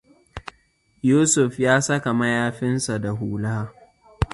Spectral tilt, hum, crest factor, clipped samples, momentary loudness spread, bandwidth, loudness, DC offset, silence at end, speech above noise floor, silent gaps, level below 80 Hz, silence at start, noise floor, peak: -5 dB/octave; none; 20 dB; under 0.1%; 21 LU; 11.5 kHz; -21 LUFS; under 0.1%; 0.1 s; 41 dB; none; -42 dBFS; 0.35 s; -62 dBFS; -2 dBFS